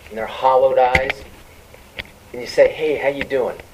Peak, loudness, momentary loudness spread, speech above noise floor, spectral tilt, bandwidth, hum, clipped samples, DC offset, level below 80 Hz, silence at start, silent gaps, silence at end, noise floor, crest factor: 0 dBFS; -17 LUFS; 19 LU; 26 dB; -4.5 dB/octave; 15.5 kHz; none; under 0.1%; under 0.1%; -42 dBFS; 0.05 s; none; 0.1 s; -44 dBFS; 20 dB